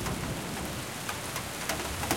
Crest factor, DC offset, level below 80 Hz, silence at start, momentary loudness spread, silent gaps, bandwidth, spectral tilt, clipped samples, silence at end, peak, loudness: 24 dB; 0.1%; -48 dBFS; 0 s; 3 LU; none; 17 kHz; -3.5 dB/octave; under 0.1%; 0 s; -10 dBFS; -34 LUFS